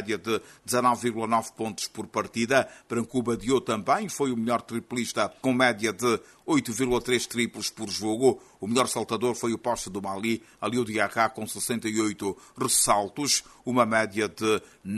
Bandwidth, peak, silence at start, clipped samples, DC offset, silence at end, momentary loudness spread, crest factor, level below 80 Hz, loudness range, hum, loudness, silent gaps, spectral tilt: 12.5 kHz; -6 dBFS; 0 s; under 0.1%; under 0.1%; 0 s; 8 LU; 22 dB; -58 dBFS; 2 LU; none; -27 LUFS; none; -3.5 dB/octave